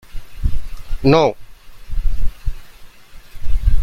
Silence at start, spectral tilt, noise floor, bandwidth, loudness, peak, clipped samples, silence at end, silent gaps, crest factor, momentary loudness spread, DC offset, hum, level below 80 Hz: 0.15 s; -7 dB/octave; -37 dBFS; 6.2 kHz; -20 LUFS; 0 dBFS; under 0.1%; 0 s; none; 14 dB; 22 LU; under 0.1%; none; -22 dBFS